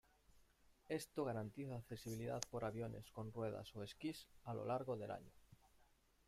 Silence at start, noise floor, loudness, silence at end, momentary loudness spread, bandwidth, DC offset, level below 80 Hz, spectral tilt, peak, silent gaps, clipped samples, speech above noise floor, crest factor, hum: 0.35 s; -75 dBFS; -48 LUFS; 0.45 s; 7 LU; 16 kHz; under 0.1%; -72 dBFS; -5.5 dB/octave; -22 dBFS; none; under 0.1%; 27 dB; 28 dB; none